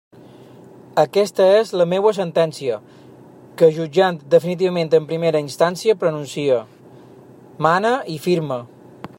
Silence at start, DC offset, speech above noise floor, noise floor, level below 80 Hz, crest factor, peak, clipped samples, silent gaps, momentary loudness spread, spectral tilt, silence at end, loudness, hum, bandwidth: 0.95 s; under 0.1%; 26 dB; -44 dBFS; -68 dBFS; 18 dB; -2 dBFS; under 0.1%; none; 8 LU; -6 dB/octave; 0.1 s; -18 LUFS; none; 16.5 kHz